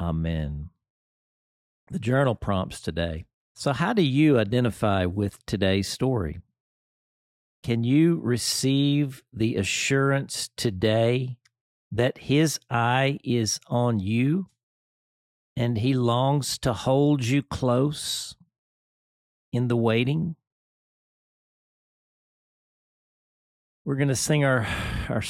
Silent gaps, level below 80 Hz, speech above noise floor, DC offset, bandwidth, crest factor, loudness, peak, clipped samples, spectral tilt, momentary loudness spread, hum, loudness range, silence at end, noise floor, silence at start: 0.90-1.87 s, 3.34-3.55 s, 6.60-7.63 s, 11.61-11.91 s, 14.63-15.56 s, 18.58-19.52 s, 20.47-23.85 s; -48 dBFS; over 66 dB; under 0.1%; 16 kHz; 18 dB; -25 LUFS; -8 dBFS; under 0.1%; -5.5 dB/octave; 10 LU; none; 5 LU; 0 s; under -90 dBFS; 0 s